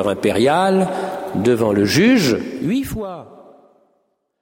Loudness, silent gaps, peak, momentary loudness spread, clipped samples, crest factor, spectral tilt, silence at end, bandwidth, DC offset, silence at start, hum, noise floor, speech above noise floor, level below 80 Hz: -17 LUFS; none; -2 dBFS; 12 LU; under 0.1%; 16 dB; -5.5 dB/octave; 1.05 s; 16.5 kHz; under 0.1%; 0 s; none; -66 dBFS; 50 dB; -48 dBFS